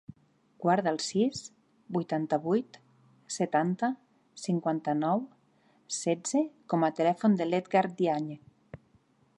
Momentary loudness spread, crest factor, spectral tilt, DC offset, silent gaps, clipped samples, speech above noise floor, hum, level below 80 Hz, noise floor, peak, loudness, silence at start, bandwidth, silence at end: 13 LU; 18 dB; -5.5 dB/octave; under 0.1%; none; under 0.1%; 37 dB; none; -74 dBFS; -66 dBFS; -12 dBFS; -30 LUFS; 0.6 s; 11.5 kHz; 0.6 s